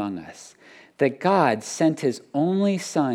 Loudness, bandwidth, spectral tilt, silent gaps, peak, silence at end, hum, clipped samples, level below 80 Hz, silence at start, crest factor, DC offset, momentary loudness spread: -23 LUFS; 14 kHz; -5.5 dB/octave; none; -6 dBFS; 0 s; none; under 0.1%; -74 dBFS; 0 s; 18 dB; under 0.1%; 10 LU